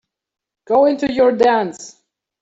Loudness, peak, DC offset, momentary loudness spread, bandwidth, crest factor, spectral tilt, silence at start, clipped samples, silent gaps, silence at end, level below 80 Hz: -16 LUFS; -2 dBFS; under 0.1%; 11 LU; 8 kHz; 16 dB; -5 dB/octave; 0.7 s; under 0.1%; none; 0.5 s; -56 dBFS